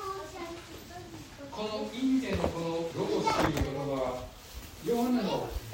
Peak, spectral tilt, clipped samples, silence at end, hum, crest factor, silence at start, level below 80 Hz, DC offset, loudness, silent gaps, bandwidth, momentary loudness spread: -14 dBFS; -5.5 dB/octave; under 0.1%; 0 s; none; 18 dB; 0 s; -48 dBFS; under 0.1%; -32 LUFS; none; 16.5 kHz; 16 LU